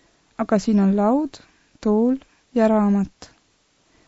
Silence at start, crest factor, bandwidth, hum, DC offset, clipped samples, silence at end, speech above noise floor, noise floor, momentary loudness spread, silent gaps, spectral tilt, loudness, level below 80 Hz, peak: 0.4 s; 16 dB; 8 kHz; none; under 0.1%; under 0.1%; 1 s; 44 dB; -63 dBFS; 12 LU; none; -8 dB/octave; -21 LUFS; -52 dBFS; -6 dBFS